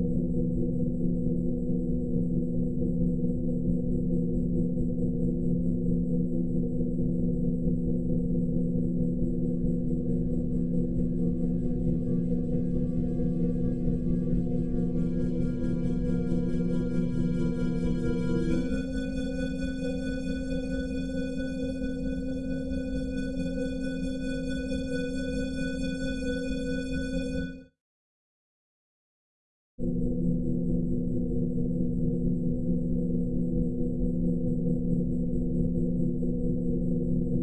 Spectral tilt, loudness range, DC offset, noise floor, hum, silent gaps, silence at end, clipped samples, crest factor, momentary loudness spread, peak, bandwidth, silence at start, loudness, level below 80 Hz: -8.5 dB/octave; 4 LU; 2%; under -90 dBFS; none; 27.80-29.78 s; 0 s; under 0.1%; 14 dB; 4 LU; -14 dBFS; 10 kHz; 0 s; -30 LUFS; -38 dBFS